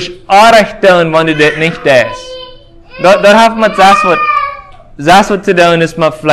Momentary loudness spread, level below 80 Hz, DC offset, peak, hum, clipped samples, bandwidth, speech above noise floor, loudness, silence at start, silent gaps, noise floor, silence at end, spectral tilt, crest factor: 10 LU; -40 dBFS; under 0.1%; 0 dBFS; none; 4%; 16 kHz; 26 dB; -7 LUFS; 0 s; none; -33 dBFS; 0 s; -4.5 dB/octave; 8 dB